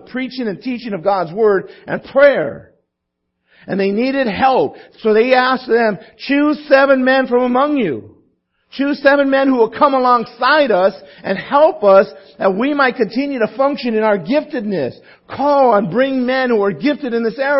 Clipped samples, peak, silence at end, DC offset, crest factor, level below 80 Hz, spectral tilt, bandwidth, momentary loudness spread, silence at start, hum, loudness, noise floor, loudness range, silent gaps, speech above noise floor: under 0.1%; 0 dBFS; 0 s; under 0.1%; 14 dB; -56 dBFS; -9 dB/octave; 5.8 kHz; 11 LU; 0.15 s; none; -15 LUFS; -74 dBFS; 4 LU; none; 60 dB